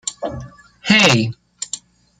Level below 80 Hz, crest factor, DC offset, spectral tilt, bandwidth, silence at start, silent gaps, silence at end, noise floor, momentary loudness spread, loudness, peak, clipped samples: -50 dBFS; 20 dB; under 0.1%; -3.5 dB/octave; 14.5 kHz; 0.05 s; none; 0.4 s; -36 dBFS; 19 LU; -14 LUFS; 0 dBFS; under 0.1%